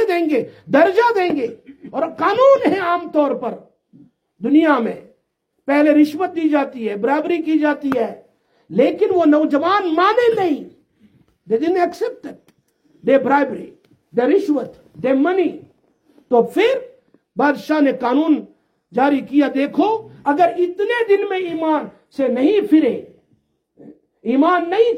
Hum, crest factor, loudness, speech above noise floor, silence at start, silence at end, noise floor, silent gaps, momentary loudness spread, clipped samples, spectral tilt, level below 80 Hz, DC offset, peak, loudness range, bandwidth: none; 16 dB; -17 LUFS; 53 dB; 0 s; 0 s; -69 dBFS; none; 12 LU; under 0.1%; -6.5 dB/octave; -66 dBFS; under 0.1%; -2 dBFS; 3 LU; 13 kHz